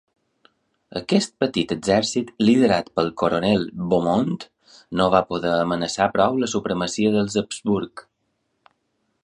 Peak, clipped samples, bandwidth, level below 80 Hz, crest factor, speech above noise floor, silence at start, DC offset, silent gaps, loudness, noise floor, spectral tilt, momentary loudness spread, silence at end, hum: -2 dBFS; under 0.1%; 11 kHz; -54 dBFS; 20 dB; 52 dB; 0.9 s; under 0.1%; none; -21 LUFS; -72 dBFS; -5 dB/octave; 7 LU; 1.25 s; none